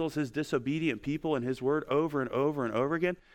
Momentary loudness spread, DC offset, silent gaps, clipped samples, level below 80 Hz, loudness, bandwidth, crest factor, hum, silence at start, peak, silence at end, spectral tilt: 3 LU; under 0.1%; none; under 0.1%; -60 dBFS; -31 LUFS; 16.5 kHz; 14 dB; none; 0 s; -16 dBFS; 0.2 s; -7 dB/octave